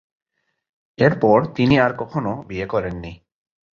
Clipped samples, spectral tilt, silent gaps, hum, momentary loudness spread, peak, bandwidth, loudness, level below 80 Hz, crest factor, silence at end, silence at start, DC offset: under 0.1%; -8 dB/octave; none; none; 13 LU; -2 dBFS; 7 kHz; -19 LUFS; -46 dBFS; 20 dB; 0.65 s; 1 s; under 0.1%